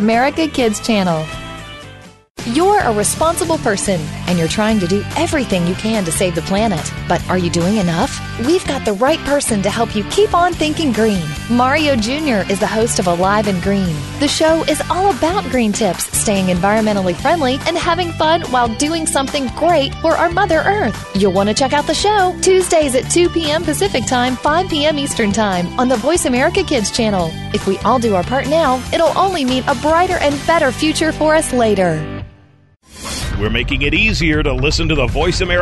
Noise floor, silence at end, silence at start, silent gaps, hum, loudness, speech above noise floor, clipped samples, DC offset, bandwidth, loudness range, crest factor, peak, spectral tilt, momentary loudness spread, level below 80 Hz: -48 dBFS; 0 s; 0 s; 2.30-2.35 s; none; -15 LUFS; 33 dB; under 0.1%; under 0.1%; 12.5 kHz; 3 LU; 12 dB; -2 dBFS; -4.5 dB/octave; 5 LU; -30 dBFS